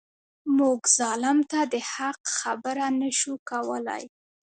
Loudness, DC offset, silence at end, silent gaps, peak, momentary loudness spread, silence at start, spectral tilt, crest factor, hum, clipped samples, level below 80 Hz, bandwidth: -25 LUFS; under 0.1%; 0.45 s; 2.20-2.24 s, 3.39-3.46 s; -6 dBFS; 10 LU; 0.45 s; -1 dB/octave; 20 dB; none; under 0.1%; -78 dBFS; 9.4 kHz